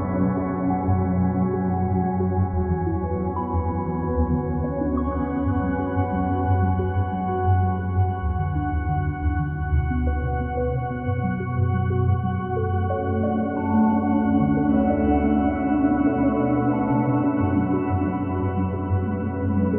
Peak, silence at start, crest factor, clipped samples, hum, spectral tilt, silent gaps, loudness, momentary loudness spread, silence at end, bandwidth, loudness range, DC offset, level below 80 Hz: -8 dBFS; 0 s; 14 dB; under 0.1%; none; -9.5 dB/octave; none; -23 LUFS; 5 LU; 0 s; 3.2 kHz; 4 LU; under 0.1%; -34 dBFS